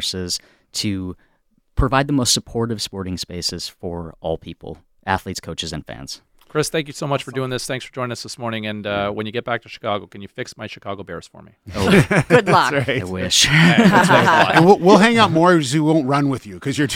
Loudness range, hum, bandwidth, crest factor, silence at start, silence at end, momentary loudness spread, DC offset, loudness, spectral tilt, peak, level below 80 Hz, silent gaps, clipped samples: 13 LU; none; 16.5 kHz; 18 dB; 0 s; 0 s; 19 LU; under 0.1%; -17 LUFS; -4.5 dB/octave; 0 dBFS; -40 dBFS; none; under 0.1%